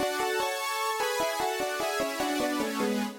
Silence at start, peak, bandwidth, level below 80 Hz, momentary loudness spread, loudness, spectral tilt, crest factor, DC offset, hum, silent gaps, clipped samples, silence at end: 0 s; -18 dBFS; 17 kHz; -62 dBFS; 1 LU; -29 LUFS; -2.5 dB/octave; 12 dB; under 0.1%; none; none; under 0.1%; 0 s